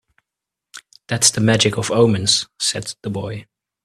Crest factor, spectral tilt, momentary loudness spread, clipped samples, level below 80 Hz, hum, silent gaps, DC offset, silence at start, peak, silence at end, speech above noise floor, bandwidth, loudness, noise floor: 20 dB; -3.5 dB/octave; 13 LU; under 0.1%; -54 dBFS; none; none; under 0.1%; 0.75 s; 0 dBFS; 0.4 s; 67 dB; 13.5 kHz; -17 LUFS; -85 dBFS